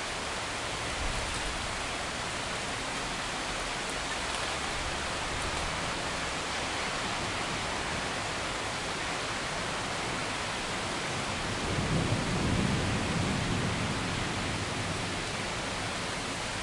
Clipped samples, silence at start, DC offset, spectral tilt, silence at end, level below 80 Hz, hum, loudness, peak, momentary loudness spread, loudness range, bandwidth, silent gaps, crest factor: under 0.1%; 0 s; under 0.1%; -3.5 dB/octave; 0 s; -46 dBFS; none; -32 LUFS; -16 dBFS; 3 LU; 3 LU; 11.5 kHz; none; 16 dB